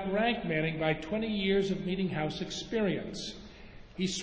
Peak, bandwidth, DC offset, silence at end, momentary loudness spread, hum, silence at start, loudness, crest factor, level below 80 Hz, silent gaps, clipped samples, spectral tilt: -14 dBFS; 8 kHz; under 0.1%; 0 s; 14 LU; none; 0 s; -32 LUFS; 18 dB; -54 dBFS; none; under 0.1%; -5 dB/octave